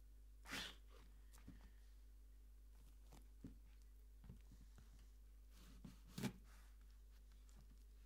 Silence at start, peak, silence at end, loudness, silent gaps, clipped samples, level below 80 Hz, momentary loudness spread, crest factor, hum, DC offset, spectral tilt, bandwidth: 0 s; -34 dBFS; 0 s; -60 LUFS; none; under 0.1%; -64 dBFS; 16 LU; 26 dB; 50 Hz at -65 dBFS; under 0.1%; -4 dB/octave; 16 kHz